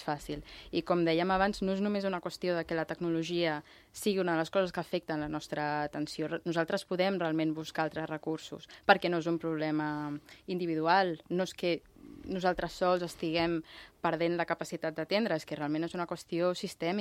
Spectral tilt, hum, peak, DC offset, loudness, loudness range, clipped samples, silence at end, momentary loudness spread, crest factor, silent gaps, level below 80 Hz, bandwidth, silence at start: -5.5 dB/octave; none; -8 dBFS; under 0.1%; -33 LUFS; 2 LU; under 0.1%; 0 s; 10 LU; 26 dB; none; -60 dBFS; 15.5 kHz; 0 s